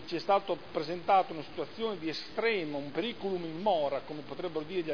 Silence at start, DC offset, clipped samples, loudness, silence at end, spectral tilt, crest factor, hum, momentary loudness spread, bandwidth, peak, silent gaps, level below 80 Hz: 0 s; 0.4%; under 0.1%; -33 LUFS; 0 s; -6 dB/octave; 18 dB; none; 10 LU; 5.4 kHz; -14 dBFS; none; -68 dBFS